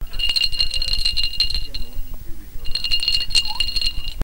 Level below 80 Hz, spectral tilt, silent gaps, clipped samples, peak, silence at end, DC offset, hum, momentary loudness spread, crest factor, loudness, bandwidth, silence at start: -26 dBFS; -0.5 dB/octave; none; under 0.1%; 0 dBFS; 0 s; under 0.1%; none; 19 LU; 18 dB; -20 LUFS; 16.5 kHz; 0 s